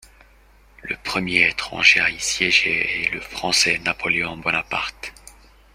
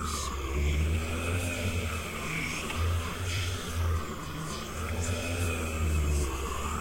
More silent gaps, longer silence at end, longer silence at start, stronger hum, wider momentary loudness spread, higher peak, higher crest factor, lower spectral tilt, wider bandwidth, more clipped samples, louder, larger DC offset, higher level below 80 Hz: neither; first, 0.45 s vs 0 s; first, 0.85 s vs 0 s; neither; first, 14 LU vs 5 LU; first, 0 dBFS vs -18 dBFS; first, 22 dB vs 14 dB; second, -1.5 dB/octave vs -4.5 dB/octave; about the same, 16 kHz vs 16.5 kHz; neither; first, -19 LUFS vs -32 LUFS; neither; second, -50 dBFS vs -38 dBFS